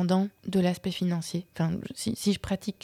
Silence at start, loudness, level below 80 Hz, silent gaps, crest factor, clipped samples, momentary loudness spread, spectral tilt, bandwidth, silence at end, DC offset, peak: 0 s; -29 LUFS; -56 dBFS; none; 16 dB; under 0.1%; 6 LU; -6 dB/octave; 15 kHz; 0.1 s; under 0.1%; -12 dBFS